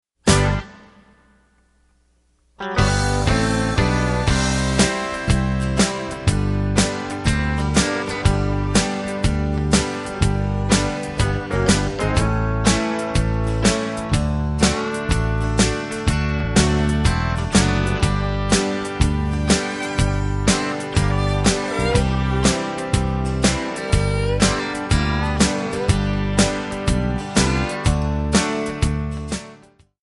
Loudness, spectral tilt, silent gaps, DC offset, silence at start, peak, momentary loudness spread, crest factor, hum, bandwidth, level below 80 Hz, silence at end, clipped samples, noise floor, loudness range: -20 LUFS; -5 dB/octave; none; under 0.1%; 0.25 s; -2 dBFS; 4 LU; 18 dB; none; 11.5 kHz; -26 dBFS; 0.45 s; under 0.1%; -61 dBFS; 1 LU